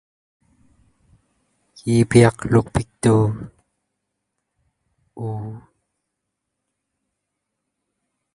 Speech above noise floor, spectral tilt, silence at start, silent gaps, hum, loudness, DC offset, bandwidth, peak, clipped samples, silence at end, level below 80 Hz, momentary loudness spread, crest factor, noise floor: 62 dB; -7 dB/octave; 1.85 s; none; 50 Hz at -55 dBFS; -19 LUFS; under 0.1%; 11.5 kHz; 0 dBFS; under 0.1%; 2.75 s; -48 dBFS; 20 LU; 24 dB; -79 dBFS